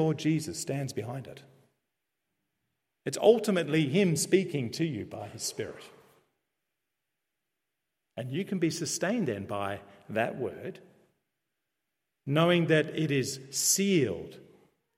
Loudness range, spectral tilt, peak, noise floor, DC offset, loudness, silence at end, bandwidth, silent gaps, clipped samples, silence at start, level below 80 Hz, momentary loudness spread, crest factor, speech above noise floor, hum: 10 LU; -4.5 dB/octave; -8 dBFS; -86 dBFS; under 0.1%; -29 LUFS; 0.55 s; 16 kHz; none; under 0.1%; 0 s; -74 dBFS; 17 LU; 22 dB; 57 dB; none